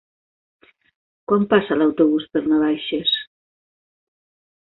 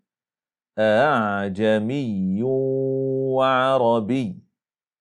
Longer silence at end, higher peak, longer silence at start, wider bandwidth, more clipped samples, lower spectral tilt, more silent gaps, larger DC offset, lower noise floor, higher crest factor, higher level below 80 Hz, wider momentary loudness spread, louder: first, 1.45 s vs 0.6 s; first, -2 dBFS vs -6 dBFS; first, 1.3 s vs 0.75 s; second, 4.3 kHz vs 10.5 kHz; neither; first, -10 dB/octave vs -7.5 dB/octave; neither; neither; about the same, under -90 dBFS vs under -90 dBFS; about the same, 20 dB vs 16 dB; first, -60 dBFS vs -70 dBFS; about the same, 6 LU vs 7 LU; about the same, -19 LUFS vs -21 LUFS